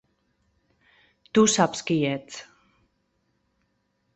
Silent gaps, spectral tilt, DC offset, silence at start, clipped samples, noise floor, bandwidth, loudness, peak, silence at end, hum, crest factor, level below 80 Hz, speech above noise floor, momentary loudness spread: none; -4 dB/octave; under 0.1%; 1.35 s; under 0.1%; -73 dBFS; 8.2 kHz; -23 LUFS; -4 dBFS; 1.75 s; none; 24 dB; -64 dBFS; 50 dB; 19 LU